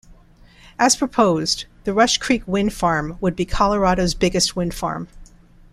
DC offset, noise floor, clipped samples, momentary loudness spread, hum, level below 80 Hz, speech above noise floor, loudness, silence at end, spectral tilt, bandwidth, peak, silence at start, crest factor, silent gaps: under 0.1%; -48 dBFS; under 0.1%; 8 LU; none; -36 dBFS; 29 dB; -19 LUFS; 0.5 s; -4 dB/octave; 15 kHz; -2 dBFS; 0.8 s; 18 dB; none